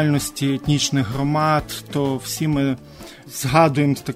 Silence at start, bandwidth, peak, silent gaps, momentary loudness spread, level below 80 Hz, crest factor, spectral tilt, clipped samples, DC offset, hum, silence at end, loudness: 0 s; 16 kHz; -2 dBFS; none; 12 LU; -44 dBFS; 18 dB; -5 dB/octave; under 0.1%; under 0.1%; none; 0 s; -20 LUFS